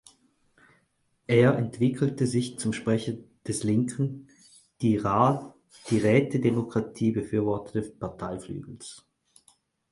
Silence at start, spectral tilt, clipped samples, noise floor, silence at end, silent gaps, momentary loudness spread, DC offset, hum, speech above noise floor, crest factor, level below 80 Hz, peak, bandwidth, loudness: 1.3 s; -6.5 dB/octave; under 0.1%; -71 dBFS; 0.9 s; none; 17 LU; under 0.1%; none; 45 dB; 20 dB; -58 dBFS; -8 dBFS; 11.5 kHz; -27 LUFS